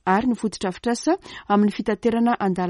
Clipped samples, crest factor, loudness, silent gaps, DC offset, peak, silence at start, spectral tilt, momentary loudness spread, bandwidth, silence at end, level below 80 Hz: under 0.1%; 16 dB; -22 LUFS; none; under 0.1%; -6 dBFS; 0.05 s; -6 dB/octave; 6 LU; 11.5 kHz; 0 s; -54 dBFS